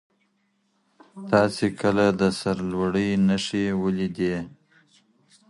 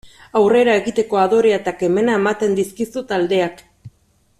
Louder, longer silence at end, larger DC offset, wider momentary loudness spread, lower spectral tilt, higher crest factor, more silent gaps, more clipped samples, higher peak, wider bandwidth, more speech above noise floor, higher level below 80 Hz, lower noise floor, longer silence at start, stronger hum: second, -23 LUFS vs -17 LUFS; first, 1 s vs 0.5 s; neither; about the same, 6 LU vs 8 LU; about the same, -6 dB/octave vs -5.5 dB/octave; first, 20 dB vs 14 dB; neither; neither; about the same, -6 dBFS vs -4 dBFS; second, 11.5 kHz vs 13.5 kHz; first, 47 dB vs 43 dB; about the same, -54 dBFS vs -56 dBFS; first, -70 dBFS vs -59 dBFS; first, 1.15 s vs 0.05 s; neither